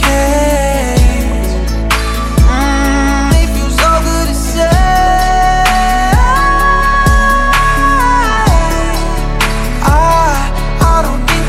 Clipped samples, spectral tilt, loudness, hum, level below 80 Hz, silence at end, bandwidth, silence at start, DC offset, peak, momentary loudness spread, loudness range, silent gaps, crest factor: under 0.1%; -4.5 dB/octave; -11 LUFS; none; -14 dBFS; 0 s; 16 kHz; 0 s; under 0.1%; 0 dBFS; 5 LU; 2 LU; none; 10 dB